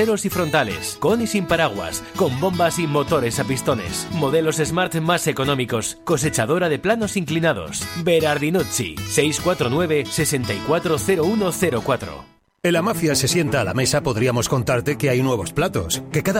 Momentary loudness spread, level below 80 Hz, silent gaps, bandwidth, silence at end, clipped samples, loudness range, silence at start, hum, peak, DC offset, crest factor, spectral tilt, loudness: 5 LU; -46 dBFS; none; 16.5 kHz; 0 s; under 0.1%; 1 LU; 0 s; none; -4 dBFS; under 0.1%; 16 dB; -4.5 dB/octave; -20 LUFS